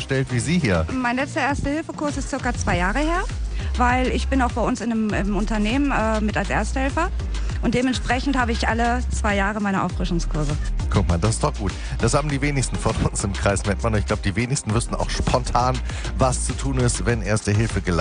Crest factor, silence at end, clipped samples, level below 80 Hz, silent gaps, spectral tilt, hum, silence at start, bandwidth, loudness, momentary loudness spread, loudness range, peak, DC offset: 16 dB; 0 s; under 0.1%; -28 dBFS; none; -5 dB/octave; none; 0 s; 10 kHz; -22 LUFS; 5 LU; 1 LU; -4 dBFS; under 0.1%